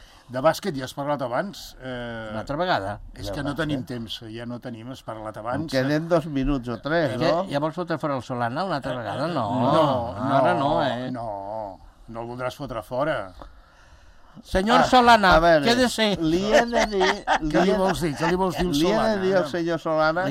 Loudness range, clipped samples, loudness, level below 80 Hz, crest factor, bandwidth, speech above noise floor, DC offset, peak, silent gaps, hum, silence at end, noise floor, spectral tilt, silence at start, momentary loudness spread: 11 LU; under 0.1%; -23 LUFS; -42 dBFS; 20 dB; 16 kHz; 27 dB; under 0.1%; -4 dBFS; none; none; 0 s; -50 dBFS; -5.5 dB/octave; 0 s; 15 LU